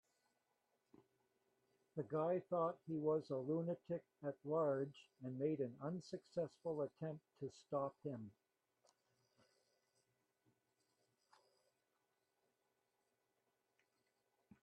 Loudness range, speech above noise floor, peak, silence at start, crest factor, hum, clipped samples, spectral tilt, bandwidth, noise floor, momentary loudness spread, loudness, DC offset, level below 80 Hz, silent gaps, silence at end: 10 LU; 43 dB; -28 dBFS; 1.95 s; 20 dB; none; under 0.1%; -8.5 dB/octave; 9 kHz; -87 dBFS; 11 LU; -45 LUFS; under 0.1%; -88 dBFS; none; 6.35 s